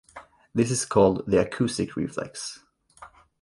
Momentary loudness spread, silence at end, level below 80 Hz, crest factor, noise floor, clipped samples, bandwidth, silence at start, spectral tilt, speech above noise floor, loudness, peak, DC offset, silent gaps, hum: 13 LU; 0.35 s; -52 dBFS; 20 dB; -51 dBFS; under 0.1%; 11.5 kHz; 0.15 s; -5 dB/octave; 26 dB; -25 LUFS; -6 dBFS; under 0.1%; none; none